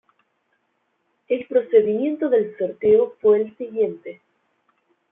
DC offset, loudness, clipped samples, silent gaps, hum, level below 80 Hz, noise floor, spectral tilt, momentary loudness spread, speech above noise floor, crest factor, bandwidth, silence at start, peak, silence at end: under 0.1%; -20 LUFS; under 0.1%; none; none; -68 dBFS; -71 dBFS; -10.5 dB/octave; 9 LU; 51 dB; 18 dB; 3.7 kHz; 1.3 s; -4 dBFS; 1 s